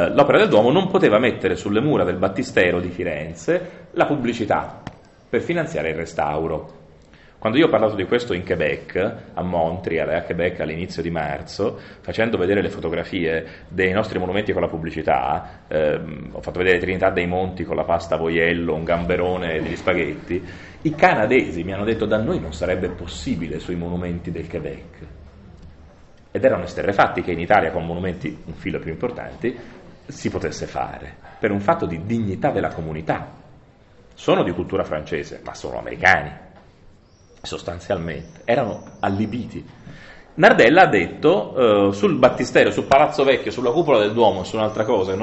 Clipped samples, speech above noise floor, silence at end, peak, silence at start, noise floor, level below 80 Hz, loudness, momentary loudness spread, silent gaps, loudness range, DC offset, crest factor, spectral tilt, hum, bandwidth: under 0.1%; 30 dB; 0 s; 0 dBFS; 0 s; -50 dBFS; -44 dBFS; -20 LUFS; 14 LU; none; 9 LU; under 0.1%; 20 dB; -6 dB/octave; none; 8.2 kHz